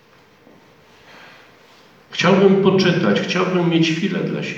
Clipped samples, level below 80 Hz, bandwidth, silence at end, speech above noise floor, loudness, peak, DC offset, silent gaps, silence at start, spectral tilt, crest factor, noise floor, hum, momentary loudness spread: under 0.1%; -62 dBFS; 7.8 kHz; 0 s; 34 dB; -17 LUFS; -2 dBFS; under 0.1%; none; 2.1 s; -6 dB/octave; 18 dB; -50 dBFS; none; 8 LU